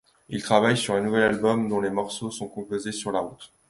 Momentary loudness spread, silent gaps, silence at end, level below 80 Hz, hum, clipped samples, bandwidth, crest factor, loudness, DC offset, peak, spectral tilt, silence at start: 12 LU; none; 0.25 s; -58 dBFS; none; under 0.1%; 11.5 kHz; 20 dB; -25 LUFS; under 0.1%; -4 dBFS; -4.5 dB/octave; 0.3 s